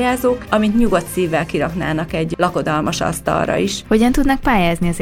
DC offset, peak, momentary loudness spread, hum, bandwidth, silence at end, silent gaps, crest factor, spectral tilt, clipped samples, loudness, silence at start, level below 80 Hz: under 0.1%; -2 dBFS; 5 LU; none; 16.5 kHz; 0 s; none; 16 dB; -5.5 dB/octave; under 0.1%; -17 LUFS; 0 s; -30 dBFS